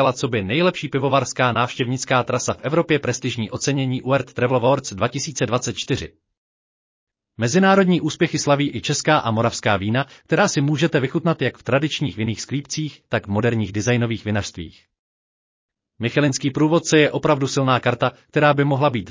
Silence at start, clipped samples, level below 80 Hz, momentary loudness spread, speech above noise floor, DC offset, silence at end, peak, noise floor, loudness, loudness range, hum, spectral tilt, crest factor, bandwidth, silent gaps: 0 s; under 0.1%; -50 dBFS; 8 LU; over 70 dB; under 0.1%; 0 s; -4 dBFS; under -90 dBFS; -20 LUFS; 5 LU; none; -5 dB/octave; 16 dB; 7.8 kHz; 6.38-7.07 s, 14.99-15.69 s